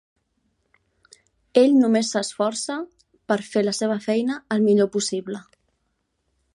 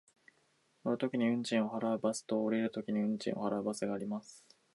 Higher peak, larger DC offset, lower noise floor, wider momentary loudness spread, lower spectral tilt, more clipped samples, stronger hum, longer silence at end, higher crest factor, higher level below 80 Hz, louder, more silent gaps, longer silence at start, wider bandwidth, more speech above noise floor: first, -4 dBFS vs -18 dBFS; neither; about the same, -73 dBFS vs -73 dBFS; first, 13 LU vs 7 LU; about the same, -4.5 dB/octave vs -5.5 dB/octave; neither; neither; first, 1.15 s vs 0.35 s; about the same, 20 dB vs 18 dB; first, -70 dBFS vs -78 dBFS; first, -22 LUFS vs -35 LUFS; neither; first, 1.55 s vs 0.85 s; about the same, 11.5 kHz vs 11.5 kHz; first, 52 dB vs 39 dB